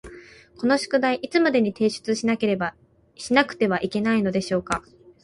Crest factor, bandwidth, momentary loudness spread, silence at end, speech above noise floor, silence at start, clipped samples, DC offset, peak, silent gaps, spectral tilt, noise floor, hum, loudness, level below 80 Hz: 20 dB; 11.5 kHz; 8 LU; 0.45 s; 23 dB; 0.05 s; under 0.1%; under 0.1%; -4 dBFS; none; -5 dB/octave; -45 dBFS; none; -23 LUFS; -56 dBFS